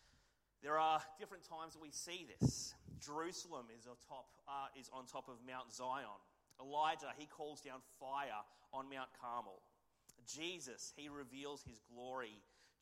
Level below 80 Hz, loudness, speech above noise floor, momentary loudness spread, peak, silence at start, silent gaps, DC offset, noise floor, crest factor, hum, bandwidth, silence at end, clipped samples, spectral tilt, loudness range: -70 dBFS; -47 LUFS; 30 dB; 17 LU; -22 dBFS; 0.6 s; none; under 0.1%; -77 dBFS; 26 dB; none; 16 kHz; 0.15 s; under 0.1%; -4 dB/octave; 8 LU